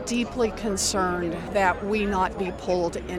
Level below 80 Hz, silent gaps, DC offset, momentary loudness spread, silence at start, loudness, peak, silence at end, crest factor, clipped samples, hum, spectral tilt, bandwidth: -42 dBFS; none; under 0.1%; 4 LU; 0 s; -25 LUFS; -8 dBFS; 0 s; 18 dB; under 0.1%; none; -4 dB/octave; 16.5 kHz